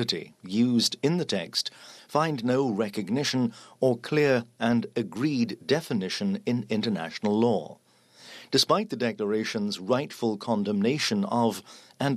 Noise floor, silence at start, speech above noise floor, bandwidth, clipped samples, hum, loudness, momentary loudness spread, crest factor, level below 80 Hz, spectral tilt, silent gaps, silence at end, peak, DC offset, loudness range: -53 dBFS; 0 s; 26 dB; 14 kHz; under 0.1%; none; -27 LUFS; 7 LU; 18 dB; -74 dBFS; -5 dB/octave; none; 0 s; -8 dBFS; under 0.1%; 1 LU